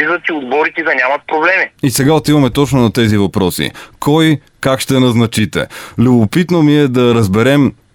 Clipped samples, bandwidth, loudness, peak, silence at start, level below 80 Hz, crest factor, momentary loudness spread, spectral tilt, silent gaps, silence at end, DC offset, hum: under 0.1%; 18 kHz; -12 LUFS; 0 dBFS; 0 s; -40 dBFS; 12 dB; 6 LU; -5.5 dB/octave; none; 0.25 s; under 0.1%; none